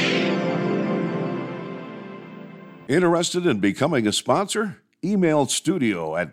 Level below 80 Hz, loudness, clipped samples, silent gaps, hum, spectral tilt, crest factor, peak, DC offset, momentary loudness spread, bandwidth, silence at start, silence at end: -66 dBFS; -22 LUFS; under 0.1%; none; none; -4.5 dB/octave; 16 dB; -6 dBFS; under 0.1%; 18 LU; 15 kHz; 0 s; 0 s